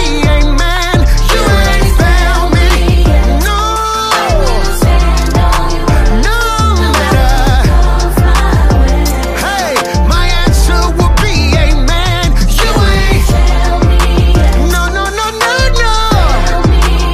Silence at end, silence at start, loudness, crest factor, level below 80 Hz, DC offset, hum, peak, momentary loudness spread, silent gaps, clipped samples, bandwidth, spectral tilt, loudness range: 0 s; 0 s; -10 LUFS; 8 dB; -10 dBFS; under 0.1%; none; 0 dBFS; 3 LU; none; under 0.1%; 15.5 kHz; -5 dB/octave; 1 LU